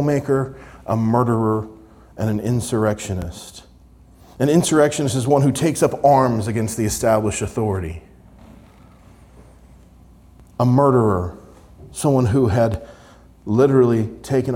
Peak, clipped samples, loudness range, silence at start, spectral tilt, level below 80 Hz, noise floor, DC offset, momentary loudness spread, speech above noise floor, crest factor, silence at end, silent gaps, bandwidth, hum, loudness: -2 dBFS; under 0.1%; 7 LU; 0 s; -6.5 dB/octave; -46 dBFS; -47 dBFS; under 0.1%; 16 LU; 30 dB; 16 dB; 0 s; none; 17 kHz; none; -19 LUFS